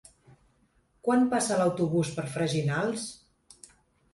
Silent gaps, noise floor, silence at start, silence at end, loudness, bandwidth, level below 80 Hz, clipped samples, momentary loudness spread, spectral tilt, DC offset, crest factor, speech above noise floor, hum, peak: none; -68 dBFS; 1.05 s; 1 s; -28 LUFS; 11.5 kHz; -64 dBFS; under 0.1%; 9 LU; -5.5 dB/octave; under 0.1%; 16 dB; 41 dB; none; -14 dBFS